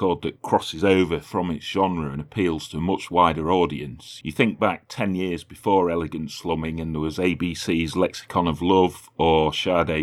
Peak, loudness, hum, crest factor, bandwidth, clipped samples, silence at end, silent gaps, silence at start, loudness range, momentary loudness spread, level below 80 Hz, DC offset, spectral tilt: -4 dBFS; -23 LUFS; none; 18 dB; 14.5 kHz; under 0.1%; 0 s; none; 0 s; 2 LU; 9 LU; -46 dBFS; under 0.1%; -6 dB/octave